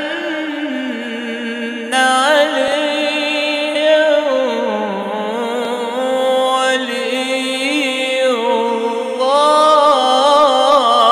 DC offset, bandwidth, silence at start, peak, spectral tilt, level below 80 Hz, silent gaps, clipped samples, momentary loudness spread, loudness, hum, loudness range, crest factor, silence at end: under 0.1%; 15.5 kHz; 0 s; 0 dBFS; -2 dB/octave; -66 dBFS; none; under 0.1%; 10 LU; -15 LUFS; none; 4 LU; 14 dB; 0 s